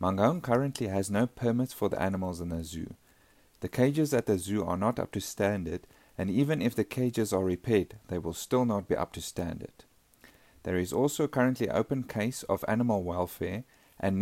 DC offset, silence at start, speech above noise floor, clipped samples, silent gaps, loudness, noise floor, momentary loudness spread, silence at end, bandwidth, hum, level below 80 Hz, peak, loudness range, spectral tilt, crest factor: under 0.1%; 0 s; 33 dB; under 0.1%; none; -30 LUFS; -62 dBFS; 9 LU; 0 s; 16 kHz; none; -58 dBFS; -10 dBFS; 2 LU; -6 dB/octave; 20 dB